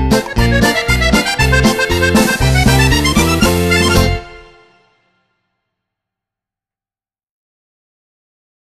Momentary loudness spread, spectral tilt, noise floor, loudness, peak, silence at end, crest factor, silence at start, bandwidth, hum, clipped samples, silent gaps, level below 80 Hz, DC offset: 3 LU; -4.5 dB/octave; under -90 dBFS; -12 LUFS; 0 dBFS; 4.25 s; 14 dB; 0 s; 14 kHz; none; under 0.1%; none; -22 dBFS; under 0.1%